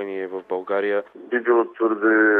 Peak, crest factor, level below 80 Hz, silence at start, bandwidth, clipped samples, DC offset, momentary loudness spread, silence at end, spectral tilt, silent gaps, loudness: -6 dBFS; 14 dB; -80 dBFS; 0 s; 4 kHz; under 0.1%; under 0.1%; 10 LU; 0 s; -8 dB/octave; none; -22 LUFS